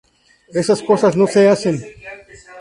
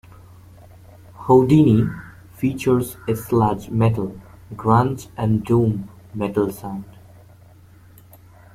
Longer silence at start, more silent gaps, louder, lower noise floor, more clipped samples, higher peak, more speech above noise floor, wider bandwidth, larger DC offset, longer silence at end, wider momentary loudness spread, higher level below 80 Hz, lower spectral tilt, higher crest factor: second, 0.55 s vs 1.2 s; neither; first, -15 LUFS vs -19 LUFS; second, -38 dBFS vs -47 dBFS; neither; about the same, -2 dBFS vs -2 dBFS; second, 24 dB vs 29 dB; second, 11 kHz vs 15.5 kHz; neither; second, 0 s vs 1.65 s; first, 22 LU vs 18 LU; second, -56 dBFS vs -48 dBFS; second, -6 dB/octave vs -8.5 dB/octave; about the same, 16 dB vs 18 dB